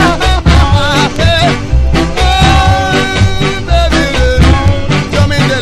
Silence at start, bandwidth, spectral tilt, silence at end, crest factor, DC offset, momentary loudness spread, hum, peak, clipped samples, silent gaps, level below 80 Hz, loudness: 0 s; 13.5 kHz; -5.5 dB/octave; 0 s; 8 dB; under 0.1%; 4 LU; none; 0 dBFS; 0.4%; none; -14 dBFS; -9 LUFS